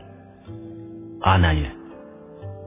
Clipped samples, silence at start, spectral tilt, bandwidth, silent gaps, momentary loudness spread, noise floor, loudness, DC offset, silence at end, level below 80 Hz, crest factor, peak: under 0.1%; 0.1 s; -10.5 dB/octave; 3.8 kHz; none; 24 LU; -44 dBFS; -21 LUFS; under 0.1%; 0 s; -32 dBFS; 22 dB; -4 dBFS